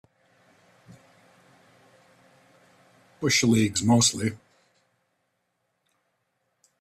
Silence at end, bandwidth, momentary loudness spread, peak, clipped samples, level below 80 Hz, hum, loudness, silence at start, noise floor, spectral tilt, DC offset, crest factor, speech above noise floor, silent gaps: 2.45 s; 14.5 kHz; 11 LU; -8 dBFS; under 0.1%; -62 dBFS; none; -22 LUFS; 3.2 s; -76 dBFS; -3.5 dB/octave; under 0.1%; 22 dB; 54 dB; none